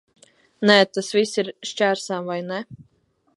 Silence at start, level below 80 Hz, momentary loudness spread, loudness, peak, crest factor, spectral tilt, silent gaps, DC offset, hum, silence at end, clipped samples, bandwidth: 0.6 s; -70 dBFS; 14 LU; -21 LUFS; 0 dBFS; 22 dB; -4 dB/octave; none; under 0.1%; none; 0.55 s; under 0.1%; 11.5 kHz